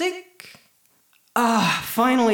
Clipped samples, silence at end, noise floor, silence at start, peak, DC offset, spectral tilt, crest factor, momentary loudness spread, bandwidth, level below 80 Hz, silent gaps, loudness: under 0.1%; 0 s; -61 dBFS; 0 s; -6 dBFS; under 0.1%; -4 dB/octave; 16 dB; 17 LU; over 20 kHz; -62 dBFS; none; -21 LUFS